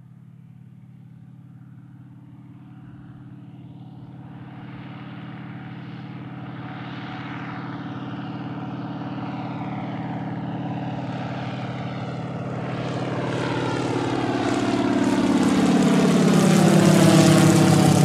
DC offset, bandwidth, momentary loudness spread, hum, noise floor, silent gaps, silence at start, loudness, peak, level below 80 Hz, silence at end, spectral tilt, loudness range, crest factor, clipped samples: under 0.1%; 15 kHz; 25 LU; none; -45 dBFS; none; 0.8 s; -22 LUFS; -2 dBFS; -56 dBFS; 0 s; -6 dB/octave; 25 LU; 20 dB; under 0.1%